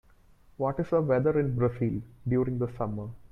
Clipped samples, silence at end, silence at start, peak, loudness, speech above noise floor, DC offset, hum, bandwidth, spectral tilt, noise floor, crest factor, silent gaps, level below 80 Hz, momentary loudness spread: under 0.1%; 0.1 s; 0.6 s; -14 dBFS; -29 LUFS; 30 dB; under 0.1%; none; 5.4 kHz; -11 dB/octave; -58 dBFS; 14 dB; none; -52 dBFS; 9 LU